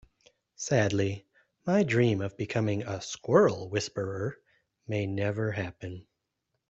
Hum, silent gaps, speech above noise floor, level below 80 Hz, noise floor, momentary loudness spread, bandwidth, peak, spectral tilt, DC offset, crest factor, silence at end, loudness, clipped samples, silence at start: none; none; 54 dB; -64 dBFS; -82 dBFS; 15 LU; 8.2 kHz; -8 dBFS; -6 dB/octave; under 0.1%; 22 dB; 0.7 s; -29 LUFS; under 0.1%; 0.6 s